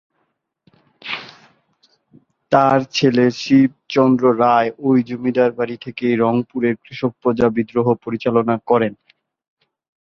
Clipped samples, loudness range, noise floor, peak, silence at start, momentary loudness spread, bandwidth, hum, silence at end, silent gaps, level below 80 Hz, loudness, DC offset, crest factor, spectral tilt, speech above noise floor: under 0.1%; 4 LU; -70 dBFS; -2 dBFS; 1.05 s; 10 LU; 7.2 kHz; none; 1.15 s; none; -56 dBFS; -17 LUFS; under 0.1%; 18 dB; -6.5 dB/octave; 54 dB